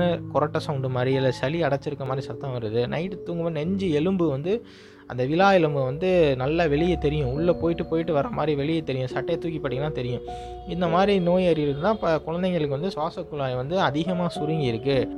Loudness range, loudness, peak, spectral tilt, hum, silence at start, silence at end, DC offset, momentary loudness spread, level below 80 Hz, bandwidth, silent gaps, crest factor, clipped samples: 4 LU; -24 LUFS; -8 dBFS; -7.5 dB/octave; none; 0 s; 0 s; under 0.1%; 9 LU; -46 dBFS; 11 kHz; none; 16 dB; under 0.1%